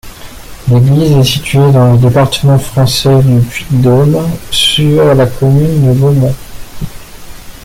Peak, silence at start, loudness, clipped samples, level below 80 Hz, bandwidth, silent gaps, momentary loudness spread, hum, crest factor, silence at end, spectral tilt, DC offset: 0 dBFS; 0.05 s; -8 LUFS; under 0.1%; -30 dBFS; 16 kHz; none; 8 LU; none; 8 dB; 0 s; -6 dB/octave; under 0.1%